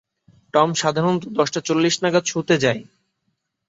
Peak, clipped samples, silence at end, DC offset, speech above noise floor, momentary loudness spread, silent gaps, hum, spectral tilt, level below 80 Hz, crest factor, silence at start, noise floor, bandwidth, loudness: -2 dBFS; under 0.1%; 0.85 s; under 0.1%; 54 dB; 4 LU; none; none; -4.5 dB/octave; -62 dBFS; 18 dB; 0.55 s; -74 dBFS; 8 kHz; -20 LUFS